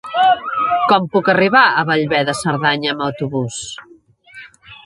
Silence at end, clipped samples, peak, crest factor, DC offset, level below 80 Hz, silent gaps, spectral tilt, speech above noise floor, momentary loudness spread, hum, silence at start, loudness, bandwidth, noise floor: 0.1 s; under 0.1%; 0 dBFS; 16 dB; under 0.1%; -56 dBFS; none; -4.5 dB/octave; 29 dB; 12 LU; none; 0.05 s; -15 LUFS; 11.5 kHz; -44 dBFS